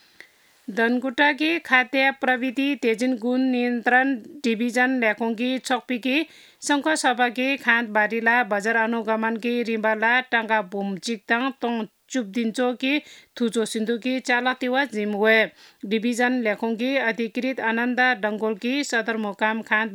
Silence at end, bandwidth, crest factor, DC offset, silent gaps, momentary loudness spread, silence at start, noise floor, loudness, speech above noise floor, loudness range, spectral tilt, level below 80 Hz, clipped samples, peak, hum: 0 s; 17 kHz; 20 dB; under 0.1%; none; 8 LU; 0.7 s; -52 dBFS; -22 LUFS; 29 dB; 3 LU; -3.5 dB/octave; -80 dBFS; under 0.1%; -4 dBFS; none